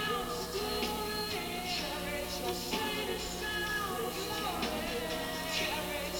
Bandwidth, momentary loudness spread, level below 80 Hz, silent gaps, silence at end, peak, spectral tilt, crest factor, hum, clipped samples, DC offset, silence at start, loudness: over 20 kHz; 2 LU; -50 dBFS; none; 0 s; -20 dBFS; -3 dB/octave; 14 dB; none; under 0.1%; under 0.1%; 0 s; -35 LUFS